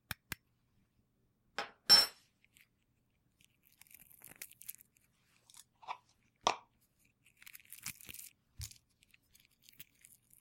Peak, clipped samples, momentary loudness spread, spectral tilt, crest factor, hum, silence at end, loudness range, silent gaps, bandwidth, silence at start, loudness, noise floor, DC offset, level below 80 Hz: -12 dBFS; under 0.1%; 31 LU; -0.5 dB/octave; 30 dB; none; 1.75 s; 22 LU; none; 17 kHz; 1.6 s; -31 LUFS; -78 dBFS; under 0.1%; -70 dBFS